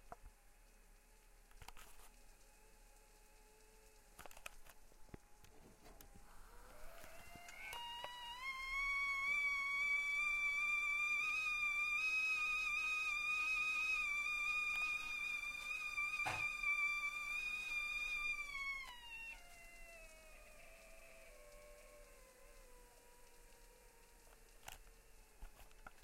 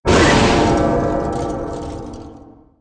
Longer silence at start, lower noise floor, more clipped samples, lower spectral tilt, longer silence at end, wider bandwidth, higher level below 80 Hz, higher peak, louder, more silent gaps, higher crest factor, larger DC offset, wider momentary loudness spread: about the same, 0.05 s vs 0.05 s; first, -66 dBFS vs -42 dBFS; neither; second, -0.5 dB/octave vs -5 dB/octave; second, 0 s vs 0.35 s; first, 16 kHz vs 10.5 kHz; second, -64 dBFS vs -28 dBFS; second, -30 dBFS vs -2 dBFS; second, -39 LUFS vs -16 LUFS; neither; about the same, 16 dB vs 16 dB; neither; first, 24 LU vs 19 LU